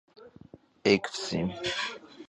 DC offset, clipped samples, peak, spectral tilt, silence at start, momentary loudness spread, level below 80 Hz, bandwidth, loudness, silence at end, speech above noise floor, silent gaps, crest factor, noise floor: under 0.1%; under 0.1%; -8 dBFS; -4.5 dB/octave; 0.15 s; 7 LU; -60 dBFS; 10.5 kHz; -29 LUFS; 0.05 s; 25 dB; none; 24 dB; -54 dBFS